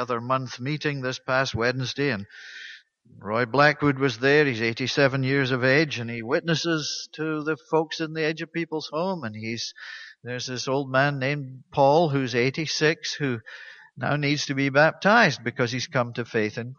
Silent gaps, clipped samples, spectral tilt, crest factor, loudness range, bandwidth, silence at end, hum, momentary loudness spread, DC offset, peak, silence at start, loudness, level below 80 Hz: none; under 0.1%; -5 dB/octave; 20 dB; 6 LU; 7.2 kHz; 0.05 s; none; 13 LU; under 0.1%; -4 dBFS; 0 s; -24 LUFS; -62 dBFS